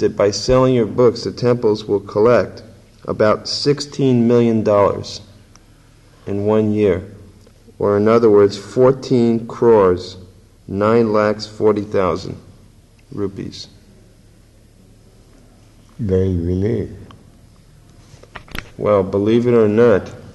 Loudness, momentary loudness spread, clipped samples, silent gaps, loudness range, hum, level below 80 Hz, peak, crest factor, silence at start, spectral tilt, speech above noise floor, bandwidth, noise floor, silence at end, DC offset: -16 LUFS; 18 LU; under 0.1%; none; 10 LU; none; -44 dBFS; -4 dBFS; 14 dB; 0 s; -6.5 dB/octave; 32 dB; 12 kHz; -47 dBFS; 0.05 s; under 0.1%